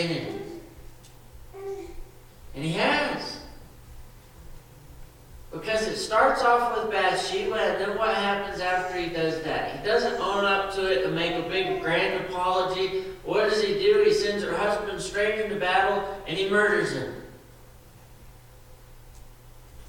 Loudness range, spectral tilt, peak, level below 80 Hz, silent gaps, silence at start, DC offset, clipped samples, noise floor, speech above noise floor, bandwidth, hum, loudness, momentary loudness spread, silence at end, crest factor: 7 LU; -4 dB/octave; -8 dBFS; -48 dBFS; none; 0 s; under 0.1%; under 0.1%; -49 dBFS; 24 dB; 19 kHz; none; -25 LUFS; 15 LU; 0 s; 20 dB